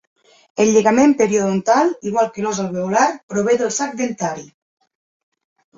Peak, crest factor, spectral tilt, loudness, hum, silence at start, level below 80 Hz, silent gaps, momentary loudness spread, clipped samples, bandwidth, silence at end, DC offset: -2 dBFS; 16 dB; -4.5 dB/octave; -17 LUFS; none; 0.55 s; -60 dBFS; 3.23-3.28 s; 9 LU; under 0.1%; 7.8 kHz; 1.35 s; under 0.1%